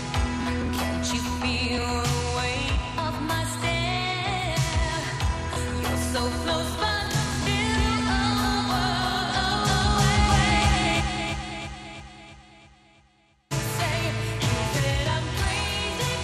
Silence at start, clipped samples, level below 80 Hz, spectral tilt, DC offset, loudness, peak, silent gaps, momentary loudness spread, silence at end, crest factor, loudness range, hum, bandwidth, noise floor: 0 s; under 0.1%; -34 dBFS; -4 dB/octave; under 0.1%; -25 LUFS; -8 dBFS; none; 8 LU; 0 s; 18 dB; 6 LU; none; 14.5 kHz; -62 dBFS